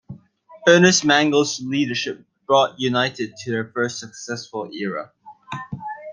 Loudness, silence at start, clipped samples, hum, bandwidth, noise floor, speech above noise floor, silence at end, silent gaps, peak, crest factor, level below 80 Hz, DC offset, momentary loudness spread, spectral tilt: -20 LUFS; 0.1 s; under 0.1%; none; 10 kHz; -47 dBFS; 27 dB; 0 s; none; -2 dBFS; 20 dB; -64 dBFS; under 0.1%; 18 LU; -3.5 dB/octave